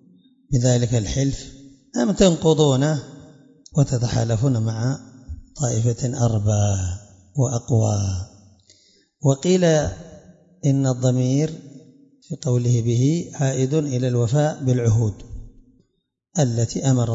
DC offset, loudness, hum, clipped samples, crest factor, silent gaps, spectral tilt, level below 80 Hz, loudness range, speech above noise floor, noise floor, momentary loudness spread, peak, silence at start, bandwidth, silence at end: under 0.1%; -21 LUFS; none; under 0.1%; 20 dB; none; -6.5 dB/octave; -44 dBFS; 3 LU; 53 dB; -72 dBFS; 14 LU; -2 dBFS; 0.5 s; 7.8 kHz; 0 s